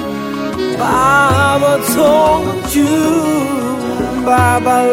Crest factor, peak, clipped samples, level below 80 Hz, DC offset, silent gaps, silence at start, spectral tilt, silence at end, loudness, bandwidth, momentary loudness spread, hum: 12 dB; -2 dBFS; under 0.1%; -38 dBFS; under 0.1%; none; 0 s; -5 dB/octave; 0 s; -13 LUFS; 17 kHz; 8 LU; none